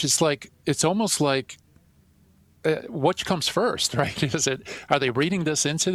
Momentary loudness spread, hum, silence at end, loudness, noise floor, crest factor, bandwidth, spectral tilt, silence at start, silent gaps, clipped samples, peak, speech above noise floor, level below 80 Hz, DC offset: 6 LU; none; 0 s; -24 LUFS; -58 dBFS; 20 dB; 15.5 kHz; -3.5 dB/octave; 0 s; none; under 0.1%; -4 dBFS; 34 dB; -56 dBFS; under 0.1%